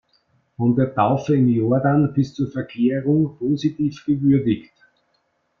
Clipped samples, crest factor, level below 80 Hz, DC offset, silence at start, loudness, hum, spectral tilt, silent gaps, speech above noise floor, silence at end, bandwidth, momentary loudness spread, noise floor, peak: under 0.1%; 16 dB; -56 dBFS; under 0.1%; 0.6 s; -20 LUFS; none; -9 dB/octave; none; 49 dB; 1 s; 6.8 kHz; 6 LU; -68 dBFS; -4 dBFS